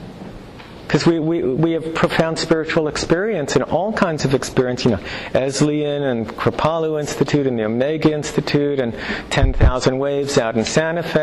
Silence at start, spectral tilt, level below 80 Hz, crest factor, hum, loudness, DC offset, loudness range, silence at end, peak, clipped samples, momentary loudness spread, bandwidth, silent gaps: 0 s; -5.5 dB/octave; -30 dBFS; 14 dB; none; -19 LUFS; under 0.1%; 1 LU; 0 s; -6 dBFS; under 0.1%; 5 LU; 12.5 kHz; none